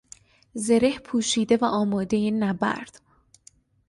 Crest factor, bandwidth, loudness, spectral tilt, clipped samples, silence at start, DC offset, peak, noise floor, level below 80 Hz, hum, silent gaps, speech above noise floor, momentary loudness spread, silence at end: 18 dB; 11.5 kHz; -24 LUFS; -4.5 dB/octave; under 0.1%; 0.55 s; under 0.1%; -6 dBFS; -57 dBFS; -58 dBFS; none; none; 34 dB; 11 LU; 1 s